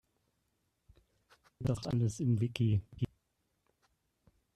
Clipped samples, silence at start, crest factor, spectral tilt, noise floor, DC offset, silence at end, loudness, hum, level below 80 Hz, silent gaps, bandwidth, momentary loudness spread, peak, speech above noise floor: under 0.1%; 1.6 s; 18 dB; -7 dB/octave; -80 dBFS; under 0.1%; 1.5 s; -34 LUFS; none; -60 dBFS; none; 12 kHz; 9 LU; -18 dBFS; 48 dB